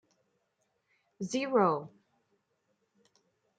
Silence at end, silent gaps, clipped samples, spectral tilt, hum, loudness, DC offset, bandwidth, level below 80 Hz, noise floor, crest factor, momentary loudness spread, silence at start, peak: 1.7 s; none; under 0.1%; -5.5 dB/octave; none; -30 LUFS; under 0.1%; 9 kHz; -84 dBFS; -79 dBFS; 22 dB; 17 LU; 1.2 s; -14 dBFS